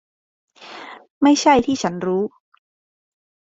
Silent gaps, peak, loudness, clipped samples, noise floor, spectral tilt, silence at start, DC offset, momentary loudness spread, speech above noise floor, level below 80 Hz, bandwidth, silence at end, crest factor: 1.10-1.21 s; -2 dBFS; -18 LUFS; under 0.1%; -38 dBFS; -4.5 dB/octave; 0.6 s; under 0.1%; 23 LU; 22 dB; -56 dBFS; 7.8 kHz; 1.25 s; 20 dB